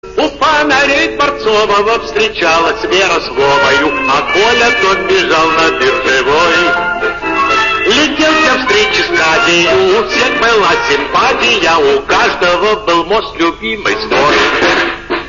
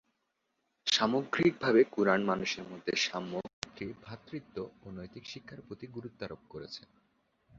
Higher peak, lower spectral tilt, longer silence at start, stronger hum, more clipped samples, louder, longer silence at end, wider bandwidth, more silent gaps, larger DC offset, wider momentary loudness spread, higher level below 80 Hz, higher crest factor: first, -2 dBFS vs -10 dBFS; second, -0.5 dB/octave vs -4 dB/octave; second, 0.05 s vs 0.85 s; neither; neither; first, -10 LUFS vs -31 LUFS; second, 0 s vs 0.8 s; about the same, 7.4 kHz vs 7.8 kHz; second, none vs 3.53-3.62 s; neither; second, 5 LU vs 19 LU; first, -36 dBFS vs -68 dBFS; second, 8 dB vs 24 dB